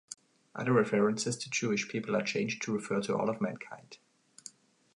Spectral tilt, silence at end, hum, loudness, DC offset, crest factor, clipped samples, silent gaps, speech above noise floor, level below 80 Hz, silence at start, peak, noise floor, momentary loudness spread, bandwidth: -4.5 dB/octave; 0.45 s; none; -32 LUFS; under 0.1%; 20 dB; under 0.1%; none; 23 dB; -76 dBFS; 0.1 s; -12 dBFS; -55 dBFS; 21 LU; 11 kHz